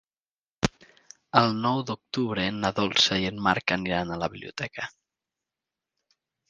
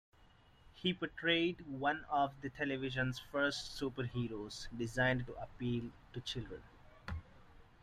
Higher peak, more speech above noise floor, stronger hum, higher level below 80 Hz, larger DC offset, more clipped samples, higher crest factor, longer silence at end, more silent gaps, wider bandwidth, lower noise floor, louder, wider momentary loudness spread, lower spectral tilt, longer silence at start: first, 0 dBFS vs -20 dBFS; first, over 64 dB vs 26 dB; neither; first, -54 dBFS vs -60 dBFS; neither; neither; first, 28 dB vs 20 dB; first, 1.6 s vs 0.2 s; neither; second, 10 kHz vs 14 kHz; first, under -90 dBFS vs -65 dBFS; first, -26 LUFS vs -39 LUFS; about the same, 12 LU vs 14 LU; about the same, -4.5 dB/octave vs -5 dB/octave; first, 0.65 s vs 0.2 s